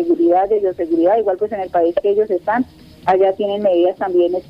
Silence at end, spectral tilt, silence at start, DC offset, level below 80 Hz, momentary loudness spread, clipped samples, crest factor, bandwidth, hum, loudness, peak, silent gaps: 0.1 s; -7.5 dB/octave; 0 s; under 0.1%; -52 dBFS; 6 LU; under 0.1%; 12 dB; 5.4 kHz; none; -16 LUFS; -4 dBFS; none